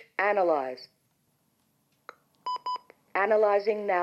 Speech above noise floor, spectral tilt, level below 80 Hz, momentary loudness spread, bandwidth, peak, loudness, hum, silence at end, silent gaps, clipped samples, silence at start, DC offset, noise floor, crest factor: 46 dB; -5.5 dB/octave; under -90 dBFS; 15 LU; 12 kHz; -12 dBFS; -27 LUFS; none; 0 s; none; under 0.1%; 0.2 s; under 0.1%; -72 dBFS; 16 dB